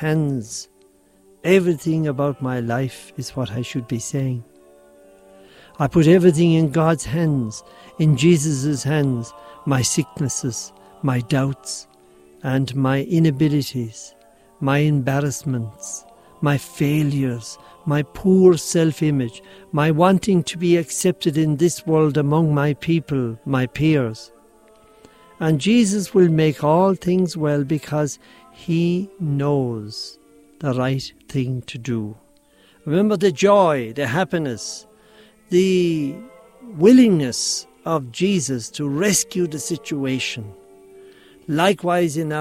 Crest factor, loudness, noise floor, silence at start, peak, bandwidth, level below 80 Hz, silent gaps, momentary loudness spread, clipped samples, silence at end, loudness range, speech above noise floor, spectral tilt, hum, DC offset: 18 dB; -20 LUFS; -54 dBFS; 0 s; -2 dBFS; 15.5 kHz; -52 dBFS; none; 14 LU; under 0.1%; 0 s; 5 LU; 36 dB; -6 dB/octave; none; under 0.1%